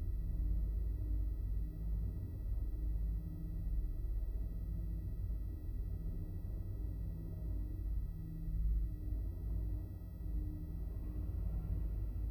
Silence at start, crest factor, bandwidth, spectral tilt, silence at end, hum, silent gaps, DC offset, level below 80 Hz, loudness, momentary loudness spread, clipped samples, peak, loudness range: 0 s; 12 dB; 13.5 kHz; -10 dB/octave; 0 s; none; none; under 0.1%; -40 dBFS; -43 LUFS; 5 LU; under 0.1%; -26 dBFS; 2 LU